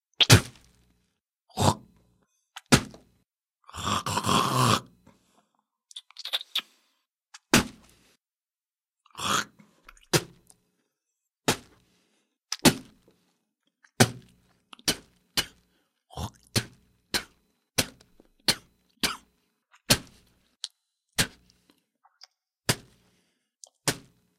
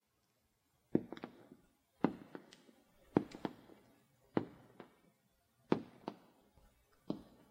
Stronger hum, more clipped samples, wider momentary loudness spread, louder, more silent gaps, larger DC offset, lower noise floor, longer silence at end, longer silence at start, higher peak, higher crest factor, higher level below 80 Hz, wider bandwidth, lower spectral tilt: neither; neither; second, 19 LU vs 23 LU; first, -26 LUFS vs -42 LUFS; neither; neither; first, under -90 dBFS vs -80 dBFS; first, 0.4 s vs 0.25 s; second, 0.2 s vs 0.95 s; first, 0 dBFS vs -14 dBFS; about the same, 30 dB vs 30 dB; first, -52 dBFS vs -76 dBFS; about the same, 16 kHz vs 16 kHz; second, -3 dB/octave vs -8 dB/octave